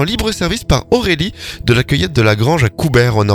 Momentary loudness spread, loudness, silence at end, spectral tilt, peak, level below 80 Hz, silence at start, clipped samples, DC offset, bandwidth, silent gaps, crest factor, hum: 5 LU; -14 LUFS; 0 s; -5.5 dB/octave; 0 dBFS; -28 dBFS; 0 s; under 0.1%; under 0.1%; 19 kHz; none; 14 dB; none